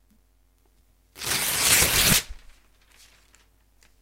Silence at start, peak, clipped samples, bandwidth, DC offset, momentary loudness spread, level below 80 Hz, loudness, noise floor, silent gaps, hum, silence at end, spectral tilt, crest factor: 1.15 s; -4 dBFS; under 0.1%; 16 kHz; under 0.1%; 15 LU; -44 dBFS; -20 LUFS; -63 dBFS; none; none; 1.65 s; -1 dB/octave; 24 dB